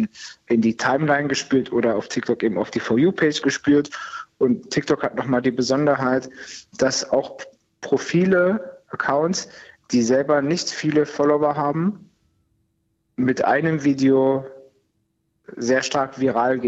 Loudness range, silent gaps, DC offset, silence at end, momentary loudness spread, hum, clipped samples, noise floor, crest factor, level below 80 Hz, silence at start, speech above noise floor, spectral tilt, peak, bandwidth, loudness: 2 LU; none; under 0.1%; 0 s; 14 LU; none; under 0.1%; -70 dBFS; 14 dB; -62 dBFS; 0 s; 50 dB; -5 dB/octave; -6 dBFS; 8.2 kHz; -21 LUFS